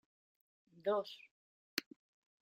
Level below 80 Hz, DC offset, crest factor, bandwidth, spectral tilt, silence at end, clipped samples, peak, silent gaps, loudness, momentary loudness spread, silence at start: under -90 dBFS; under 0.1%; 30 dB; 15.5 kHz; -3 dB/octave; 0.6 s; under 0.1%; -16 dBFS; 1.31-1.77 s; -41 LUFS; 13 LU; 0.85 s